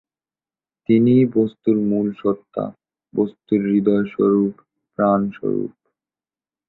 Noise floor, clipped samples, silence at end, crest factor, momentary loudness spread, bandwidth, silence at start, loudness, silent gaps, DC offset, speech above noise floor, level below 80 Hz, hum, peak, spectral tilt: under -90 dBFS; under 0.1%; 1 s; 16 dB; 13 LU; 4.2 kHz; 0.9 s; -19 LUFS; none; under 0.1%; over 72 dB; -60 dBFS; none; -4 dBFS; -12 dB/octave